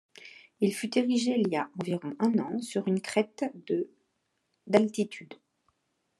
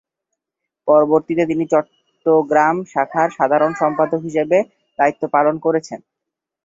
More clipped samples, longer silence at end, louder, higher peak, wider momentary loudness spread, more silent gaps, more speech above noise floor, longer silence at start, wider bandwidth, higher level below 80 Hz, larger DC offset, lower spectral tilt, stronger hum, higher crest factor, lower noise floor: neither; first, 0.85 s vs 0.7 s; second, -29 LUFS vs -17 LUFS; second, -8 dBFS vs -2 dBFS; first, 12 LU vs 9 LU; neither; second, 49 dB vs 66 dB; second, 0.2 s vs 0.85 s; first, 12.5 kHz vs 7.8 kHz; second, -80 dBFS vs -62 dBFS; neither; second, -5.5 dB/octave vs -7 dB/octave; neither; first, 22 dB vs 16 dB; second, -78 dBFS vs -82 dBFS